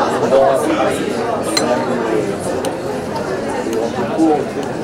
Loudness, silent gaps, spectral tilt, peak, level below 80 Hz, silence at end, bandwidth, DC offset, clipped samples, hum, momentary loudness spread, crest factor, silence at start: -17 LUFS; none; -4.5 dB/octave; 0 dBFS; -46 dBFS; 0 s; 16.5 kHz; under 0.1%; under 0.1%; none; 8 LU; 16 dB; 0 s